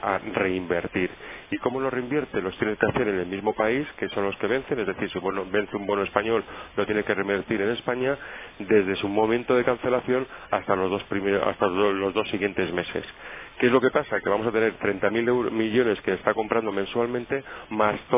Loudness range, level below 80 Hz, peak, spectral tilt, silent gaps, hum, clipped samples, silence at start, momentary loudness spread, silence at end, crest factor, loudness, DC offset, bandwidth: 3 LU; -54 dBFS; -4 dBFS; -9.5 dB/octave; none; none; under 0.1%; 0 s; 7 LU; 0 s; 22 dB; -25 LUFS; under 0.1%; 3.8 kHz